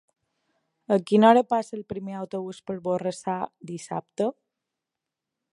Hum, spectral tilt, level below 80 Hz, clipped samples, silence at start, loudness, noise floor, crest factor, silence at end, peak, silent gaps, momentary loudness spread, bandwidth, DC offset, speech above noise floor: none; -6.5 dB/octave; -70 dBFS; under 0.1%; 0.9 s; -25 LUFS; -87 dBFS; 24 dB; 1.2 s; -4 dBFS; none; 17 LU; 11.5 kHz; under 0.1%; 62 dB